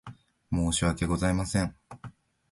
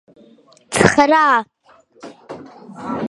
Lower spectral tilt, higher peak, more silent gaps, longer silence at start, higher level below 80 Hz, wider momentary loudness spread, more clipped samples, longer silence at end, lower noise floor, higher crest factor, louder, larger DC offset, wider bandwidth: about the same, -5 dB/octave vs -4.5 dB/octave; second, -12 dBFS vs 0 dBFS; neither; second, 0.05 s vs 0.7 s; first, -42 dBFS vs -48 dBFS; second, 20 LU vs 24 LU; neither; first, 0.4 s vs 0 s; about the same, -49 dBFS vs -52 dBFS; about the same, 18 dB vs 18 dB; second, -28 LUFS vs -14 LUFS; neither; about the same, 11.5 kHz vs 11.5 kHz